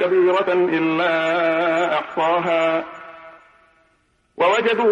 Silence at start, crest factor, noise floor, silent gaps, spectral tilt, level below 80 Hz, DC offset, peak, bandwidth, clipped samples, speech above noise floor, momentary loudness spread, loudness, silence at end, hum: 0 s; 12 dB; -63 dBFS; none; -5.5 dB/octave; -68 dBFS; under 0.1%; -8 dBFS; 7.4 kHz; under 0.1%; 45 dB; 6 LU; -19 LUFS; 0 s; none